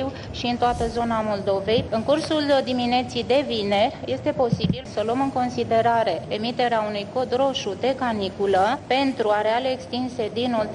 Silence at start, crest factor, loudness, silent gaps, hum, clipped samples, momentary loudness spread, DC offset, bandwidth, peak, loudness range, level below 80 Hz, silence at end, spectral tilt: 0 s; 14 dB; -23 LUFS; none; none; under 0.1%; 6 LU; under 0.1%; 11 kHz; -10 dBFS; 1 LU; -48 dBFS; 0 s; -5.5 dB/octave